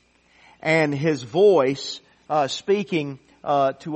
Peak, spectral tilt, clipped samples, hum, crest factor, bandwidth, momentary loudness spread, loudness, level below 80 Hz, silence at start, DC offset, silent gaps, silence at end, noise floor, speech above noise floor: -6 dBFS; -5.5 dB/octave; under 0.1%; none; 16 dB; 8.4 kHz; 15 LU; -21 LUFS; -66 dBFS; 0.65 s; under 0.1%; none; 0 s; -56 dBFS; 35 dB